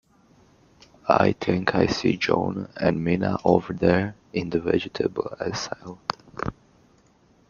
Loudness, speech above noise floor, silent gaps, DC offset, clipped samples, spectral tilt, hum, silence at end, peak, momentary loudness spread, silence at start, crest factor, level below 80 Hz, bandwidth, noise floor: -24 LUFS; 36 dB; none; under 0.1%; under 0.1%; -6 dB/octave; none; 1 s; -2 dBFS; 12 LU; 1.05 s; 24 dB; -52 dBFS; 7.2 kHz; -59 dBFS